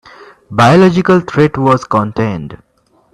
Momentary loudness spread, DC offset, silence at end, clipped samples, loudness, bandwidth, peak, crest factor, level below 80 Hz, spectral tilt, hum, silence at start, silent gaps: 13 LU; under 0.1%; 0.6 s; under 0.1%; -11 LUFS; 11.5 kHz; 0 dBFS; 12 dB; -44 dBFS; -7 dB/octave; none; 0.5 s; none